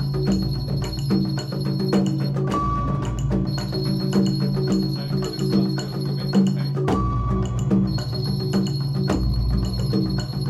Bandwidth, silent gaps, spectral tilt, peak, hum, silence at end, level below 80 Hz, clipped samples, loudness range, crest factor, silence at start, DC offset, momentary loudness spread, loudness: 12.5 kHz; none; -7 dB/octave; -8 dBFS; none; 0 s; -32 dBFS; under 0.1%; 1 LU; 14 dB; 0 s; under 0.1%; 4 LU; -23 LUFS